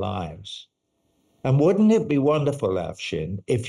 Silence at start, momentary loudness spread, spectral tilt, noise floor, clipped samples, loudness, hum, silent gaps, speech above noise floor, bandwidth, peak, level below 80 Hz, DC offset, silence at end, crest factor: 0 s; 17 LU; -7.5 dB/octave; -70 dBFS; under 0.1%; -22 LUFS; none; none; 48 dB; 11.5 kHz; -10 dBFS; -56 dBFS; under 0.1%; 0 s; 14 dB